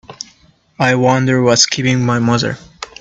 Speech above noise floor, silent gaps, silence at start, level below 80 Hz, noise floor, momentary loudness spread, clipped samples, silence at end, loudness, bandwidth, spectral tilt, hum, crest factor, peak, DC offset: 38 dB; none; 0.1 s; -50 dBFS; -51 dBFS; 20 LU; under 0.1%; 0.15 s; -13 LUFS; 8.2 kHz; -4 dB/octave; none; 16 dB; 0 dBFS; under 0.1%